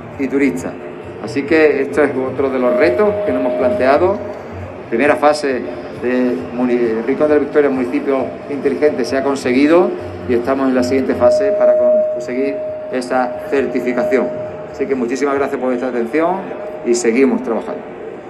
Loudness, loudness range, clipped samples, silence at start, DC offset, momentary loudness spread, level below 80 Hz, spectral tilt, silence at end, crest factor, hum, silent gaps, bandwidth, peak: -16 LUFS; 4 LU; under 0.1%; 0 s; under 0.1%; 11 LU; -54 dBFS; -5.5 dB/octave; 0 s; 16 dB; none; none; 12.5 kHz; 0 dBFS